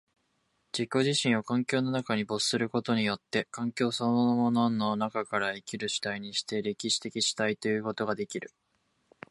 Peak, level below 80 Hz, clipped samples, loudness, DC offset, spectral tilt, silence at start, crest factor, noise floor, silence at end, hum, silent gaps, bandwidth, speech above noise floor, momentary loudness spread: -12 dBFS; -72 dBFS; under 0.1%; -29 LUFS; under 0.1%; -4 dB/octave; 0.75 s; 18 dB; -75 dBFS; 0.85 s; none; none; 11.5 kHz; 45 dB; 7 LU